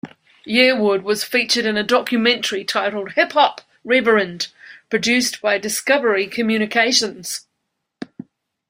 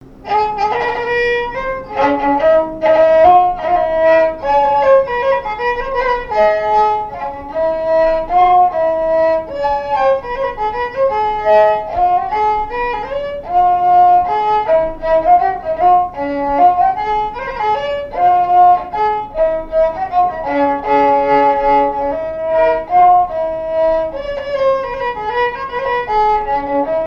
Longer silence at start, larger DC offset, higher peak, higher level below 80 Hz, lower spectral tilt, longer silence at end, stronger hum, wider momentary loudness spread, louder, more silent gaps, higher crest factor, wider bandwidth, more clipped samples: about the same, 0.05 s vs 0.05 s; neither; about the same, -2 dBFS vs 0 dBFS; second, -64 dBFS vs -36 dBFS; second, -2.5 dB/octave vs -6 dB/octave; first, 0.65 s vs 0 s; neither; first, 13 LU vs 9 LU; second, -18 LUFS vs -14 LUFS; neither; about the same, 18 dB vs 14 dB; first, 16 kHz vs 6.8 kHz; neither